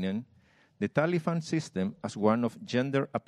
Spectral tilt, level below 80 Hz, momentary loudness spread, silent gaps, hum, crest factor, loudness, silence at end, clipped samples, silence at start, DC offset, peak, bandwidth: -6.5 dB/octave; -72 dBFS; 7 LU; none; none; 20 dB; -30 LUFS; 0.1 s; under 0.1%; 0 s; under 0.1%; -10 dBFS; 11.5 kHz